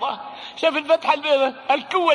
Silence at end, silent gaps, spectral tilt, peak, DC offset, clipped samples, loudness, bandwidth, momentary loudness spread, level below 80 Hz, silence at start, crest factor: 0 s; none; -2.5 dB/octave; -4 dBFS; under 0.1%; under 0.1%; -20 LUFS; 10.5 kHz; 10 LU; -70 dBFS; 0 s; 16 dB